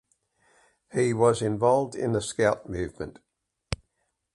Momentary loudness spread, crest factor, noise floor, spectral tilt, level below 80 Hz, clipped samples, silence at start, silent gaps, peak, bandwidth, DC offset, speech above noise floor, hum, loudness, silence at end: 14 LU; 22 dB; -77 dBFS; -5.5 dB/octave; -50 dBFS; under 0.1%; 0.95 s; none; -6 dBFS; 11.5 kHz; under 0.1%; 52 dB; none; -26 LUFS; 0.6 s